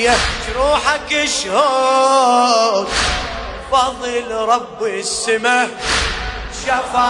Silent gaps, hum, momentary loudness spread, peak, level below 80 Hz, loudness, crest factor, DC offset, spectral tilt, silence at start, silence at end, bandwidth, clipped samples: none; none; 10 LU; 0 dBFS; -32 dBFS; -16 LUFS; 16 dB; under 0.1%; -2 dB/octave; 0 s; 0 s; 11 kHz; under 0.1%